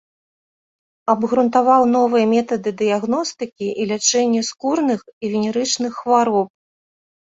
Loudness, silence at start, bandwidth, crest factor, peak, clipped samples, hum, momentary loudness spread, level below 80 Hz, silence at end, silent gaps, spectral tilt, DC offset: -18 LUFS; 1.05 s; 8 kHz; 18 dB; -2 dBFS; under 0.1%; none; 10 LU; -64 dBFS; 0.8 s; 5.13-5.21 s; -3.5 dB/octave; under 0.1%